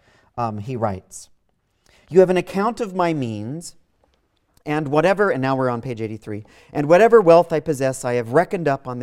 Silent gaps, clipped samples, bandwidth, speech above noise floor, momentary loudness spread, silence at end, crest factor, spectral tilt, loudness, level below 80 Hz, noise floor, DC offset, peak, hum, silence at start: none; under 0.1%; 14 kHz; 48 dB; 20 LU; 0 s; 18 dB; -6.5 dB/octave; -19 LUFS; -56 dBFS; -67 dBFS; under 0.1%; 0 dBFS; none; 0.35 s